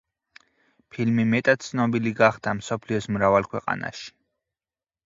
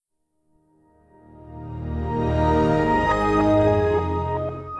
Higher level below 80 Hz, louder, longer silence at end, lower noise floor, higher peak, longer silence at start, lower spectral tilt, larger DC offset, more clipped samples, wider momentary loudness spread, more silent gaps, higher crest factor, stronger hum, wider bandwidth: second, -58 dBFS vs -36 dBFS; about the same, -23 LUFS vs -21 LUFS; first, 0.95 s vs 0 s; first, under -90 dBFS vs -70 dBFS; first, -4 dBFS vs -8 dBFS; second, 0.95 s vs 1.4 s; second, -6 dB/octave vs -8 dB/octave; neither; neither; second, 12 LU vs 15 LU; neither; first, 22 dB vs 16 dB; neither; second, 7.8 kHz vs 10.5 kHz